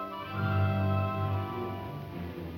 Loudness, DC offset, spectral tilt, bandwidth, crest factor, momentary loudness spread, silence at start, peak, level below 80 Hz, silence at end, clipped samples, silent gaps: -32 LUFS; under 0.1%; -9 dB/octave; 16 kHz; 14 dB; 11 LU; 0 s; -18 dBFS; -56 dBFS; 0 s; under 0.1%; none